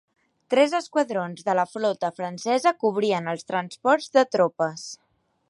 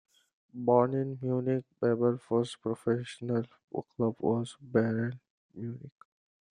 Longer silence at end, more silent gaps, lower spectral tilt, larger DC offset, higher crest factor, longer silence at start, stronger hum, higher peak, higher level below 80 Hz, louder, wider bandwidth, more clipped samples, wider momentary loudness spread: about the same, 0.55 s vs 0.65 s; second, none vs 3.64-3.68 s, 5.30-5.49 s; second, -4.5 dB/octave vs -8 dB/octave; neither; about the same, 18 dB vs 20 dB; about the same, 0.5 s vs 0.55 s; neither; first, -6 dBFS vs -12 dBFS; about the same, -76 dBFS vs -74 dBFS; first, -24 LUFS vs -31 LUFS; about the same, 11.5 kHz vs 10.5 kHz; neither; second, 9 LU vs 15 LU